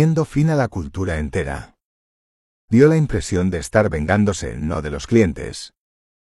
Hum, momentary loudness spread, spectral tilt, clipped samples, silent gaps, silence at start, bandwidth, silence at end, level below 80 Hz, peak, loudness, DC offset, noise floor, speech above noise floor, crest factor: none; 14 LU; -7 dB/octave; under 0.1%; 1.84-2.68 s; 0 s; 12 kHz; 0.65 s; -36 dBFS; -2 dBFS; -19 LUFS; under 0.1%; under -90 dBFS; over 72 dB; 16 dB